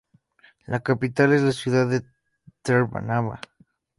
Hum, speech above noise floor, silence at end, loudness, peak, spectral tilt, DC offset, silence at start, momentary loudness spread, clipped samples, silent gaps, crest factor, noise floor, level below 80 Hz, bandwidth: none; 37 dB; 0.6 s; -23 LUFS; -6 dBFS; -7 dB/octave; under 0.1%; 0.7 s; 13 LU; under 0.1%; none; 18 dB; -58 dBFS; -58 dBFS; 11.5 kHz